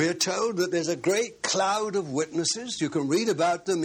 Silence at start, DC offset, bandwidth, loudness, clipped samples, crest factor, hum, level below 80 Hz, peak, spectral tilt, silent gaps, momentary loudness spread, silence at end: 0 s; under 0.1%; 16 kHz; -26 LUFS; under 0.1%; 14 dB; none; -70 dBFS; -12 dBFS; -3.5 dB/octave; none; 4 LU; 0 s